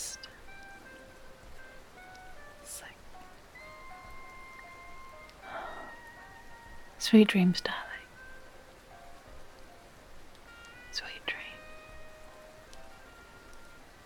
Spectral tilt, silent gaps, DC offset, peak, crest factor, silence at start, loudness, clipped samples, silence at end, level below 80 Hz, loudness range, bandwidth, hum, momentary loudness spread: -5 dB/octave; none; under 0.1%; -10 dBFS; 26 dB; 0 s; -30 LUFS; under 0.1%; 0 s; -56 dBFS; 19 LU; 17.5 kHz; none; 21 LU